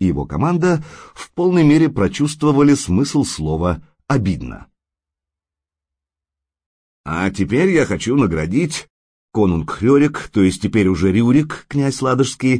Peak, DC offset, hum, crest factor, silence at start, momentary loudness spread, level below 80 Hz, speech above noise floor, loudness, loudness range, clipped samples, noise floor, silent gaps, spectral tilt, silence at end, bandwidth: -4 dBFS; under 0.1%; none; 14 dB; 0 s; 10 LU; -40 dBFS; 72 dB; -17 LUFS; 10 LU; under 0.1%; -88 dBFS; 6.66-7.04 s, 8.90-9.28 s; -6.5 dB/octave; 0 s; 10.5 kHz